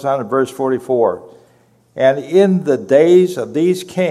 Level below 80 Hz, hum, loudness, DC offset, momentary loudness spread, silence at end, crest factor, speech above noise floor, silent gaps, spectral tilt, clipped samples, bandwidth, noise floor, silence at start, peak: -64 dBFS; none; -15 LUFS; under 0.1%; 8 LU; 0 s; 14 dB; 39 dB; none; -7 dB/octave; under 0.1%; 13.5 kHz; -53 dBFS; 0 s; 0 dBFS